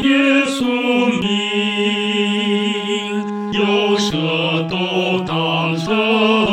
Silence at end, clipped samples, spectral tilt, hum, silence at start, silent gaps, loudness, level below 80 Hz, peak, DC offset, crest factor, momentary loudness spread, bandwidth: 0 s; under 0.1%; -5 dB/octave; none; 0 s; none; -17 LUFS; -54 dBFS; -2 dBFS; under 0.1%; 14 dB; 5 LU; 13.5 kHz